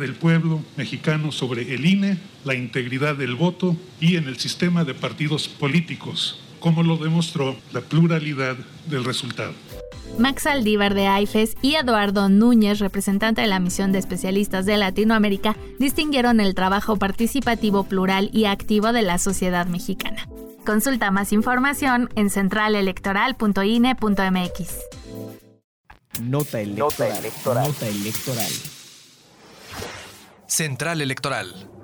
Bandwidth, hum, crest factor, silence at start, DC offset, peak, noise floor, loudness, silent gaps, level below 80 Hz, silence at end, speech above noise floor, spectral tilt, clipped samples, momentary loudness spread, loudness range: over 20 kHz; none; 12 dB; 0 s; under 0.1%; -8 dBFS; -49 dBFS; -21 LUFS; 25.64-25.84 s; -42 dBFS; 0 s; 29 dB; -5 dB/octave; under 0.1%; 12 LU; 7 LU